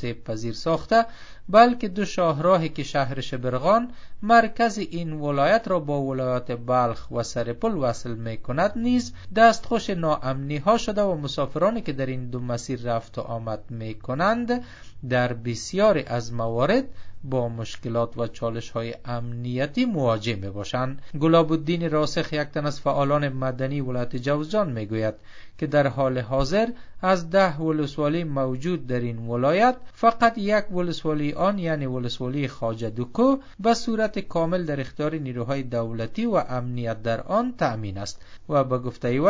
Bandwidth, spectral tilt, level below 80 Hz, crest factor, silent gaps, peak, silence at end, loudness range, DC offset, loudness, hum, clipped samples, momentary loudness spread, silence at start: 7.8 kHz; -6.5 dB/octave; -48 dBFS; 22 dB; none; -2 dBFS; 0 s; 5 LU; under 0.1%; -24 LUFS; none; under 0.1%; 11 LU; 0 s